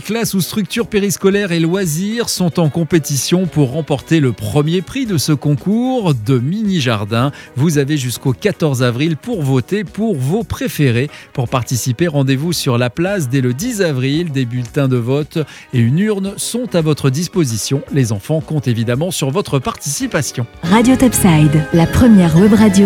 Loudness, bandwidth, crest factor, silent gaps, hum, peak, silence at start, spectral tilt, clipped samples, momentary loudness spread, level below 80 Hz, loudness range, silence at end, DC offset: -15 LUFS; 17.5 kHz; 14 dB; none; none; 0 dBFS; 0 s; -5.5 dB/octave; under 0.1%; 8 LU; -38 dBFS; 3 LU; 0 s; under 0.1%